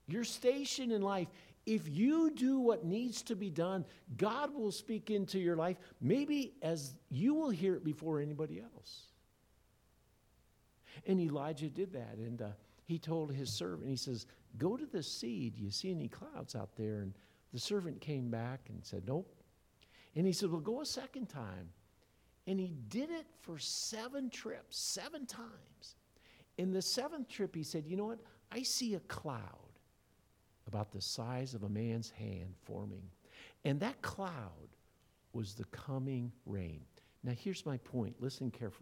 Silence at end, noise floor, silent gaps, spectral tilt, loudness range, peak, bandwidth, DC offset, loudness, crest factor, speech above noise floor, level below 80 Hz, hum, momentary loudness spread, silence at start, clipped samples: 0 s; -72 dBFS; none; -5 dB/octave; 8 LU; -18 dBFS; 17.5 kHz; under 0.1%; -40 LUFS; 22 dB; 33 dB; -72 dBFS; none; 14 LU; 0.1 s; under 0.1%